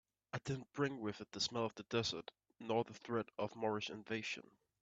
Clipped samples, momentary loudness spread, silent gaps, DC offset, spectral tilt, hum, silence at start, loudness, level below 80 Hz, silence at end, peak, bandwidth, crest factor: under 0.1%; 9 LU; none; under 0.1%; -4.5 dB/octave; none; 0.35 s; -42 LUFS; -76 dBFS; 0.4 s; -22 dBFS; 8.4 kHz; 20 dB